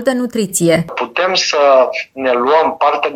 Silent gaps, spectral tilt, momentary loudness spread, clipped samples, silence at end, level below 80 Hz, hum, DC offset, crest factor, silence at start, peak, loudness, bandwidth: none; -3.5 dB/octave; 7 LU; under 0.1%; 0 s; -56 dBFS; none; under 0.1%; 12 dB; 0 s; 0 dBFS; -13 LUFS; 16 kHz